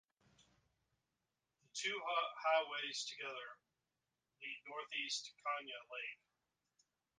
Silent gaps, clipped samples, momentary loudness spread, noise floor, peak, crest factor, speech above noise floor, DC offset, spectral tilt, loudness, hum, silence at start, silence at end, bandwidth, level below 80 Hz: none; under 0.1%; 13 LU; under -90 dBFS; -24 dBFS; 22 dB; over 47 dB; under 0.1%; 0.5 dB/octave; -42 LUFS; none; 0.4 s; 1.05 s; 9.6 kHz; under -90 dBFS